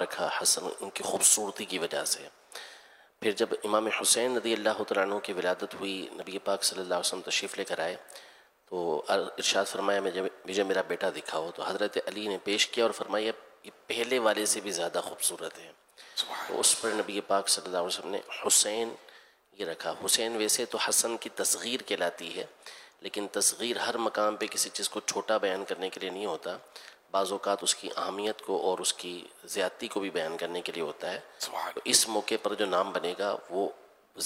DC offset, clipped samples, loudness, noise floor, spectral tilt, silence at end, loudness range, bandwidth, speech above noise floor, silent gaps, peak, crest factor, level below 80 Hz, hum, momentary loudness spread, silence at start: under 0.1%; under 0.1%; -29 LUFS; -56 dBFS; -1 dB/octave; 0 s; 4 LU; 16 kHz; 25 dB; none; -6 dBFS; 26 dB; -82 dBFS; none; 13 LU; 0 s